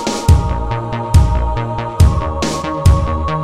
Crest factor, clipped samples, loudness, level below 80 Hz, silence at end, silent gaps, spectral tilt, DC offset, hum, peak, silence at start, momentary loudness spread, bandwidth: 14 dB; under 0.1%; -15 LUFS; -18 dBFS; 0 s; none; -6 dB/octave; 1%; none; 0 dBFS; 0 s; 7 LU; 13.5 kHz